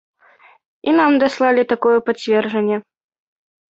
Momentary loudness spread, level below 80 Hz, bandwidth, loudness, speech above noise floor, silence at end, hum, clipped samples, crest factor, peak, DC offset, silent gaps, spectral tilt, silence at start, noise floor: 7 LU; -64 dBFS; 8 kHz; -17 LUFS; 35 dB; 0.95 s; none; under 0.1%; 16 dB; -2 dBFS; under 0.1%; none; -6 dB/octave; 0.85 s; -50 dBFS